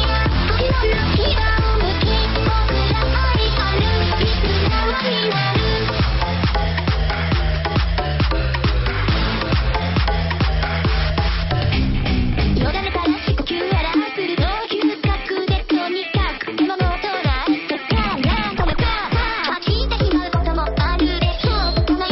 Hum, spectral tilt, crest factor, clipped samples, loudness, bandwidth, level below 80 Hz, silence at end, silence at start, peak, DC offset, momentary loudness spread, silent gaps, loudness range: none; -4 dB/octave; 10 dB; under 0.1%; -19 LUFS; 6 kHz; -22 dBFS; 0 s; 0 s; -8 dBFS; under 0.1%; 3 LU; none; 2 LU